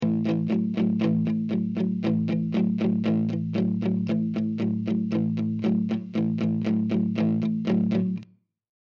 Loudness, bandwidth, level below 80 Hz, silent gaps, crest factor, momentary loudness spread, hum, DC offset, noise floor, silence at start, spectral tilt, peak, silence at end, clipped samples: -25 LUFS; 6.2 kHz; -70 dBFS; none; 12 dB; 3 LU; none; under 0.1%; -51 dBFS; 0 s; -9.5 dB/octave; -12 dBFS; 0.75 s; under 0.1%